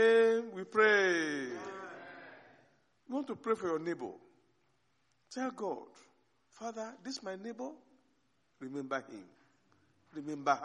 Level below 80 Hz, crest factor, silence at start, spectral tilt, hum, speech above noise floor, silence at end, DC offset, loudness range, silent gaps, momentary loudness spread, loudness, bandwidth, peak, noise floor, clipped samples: -86 dBFS; 22 dB; 0 s; -4 dB/octave; none; 41 dB; 0 s; under 0.1%; 11 LU; none; 22 LU; -34 LUFS; 9.6 kHz; -14 dBFS; -77 dBFS; under 0.1%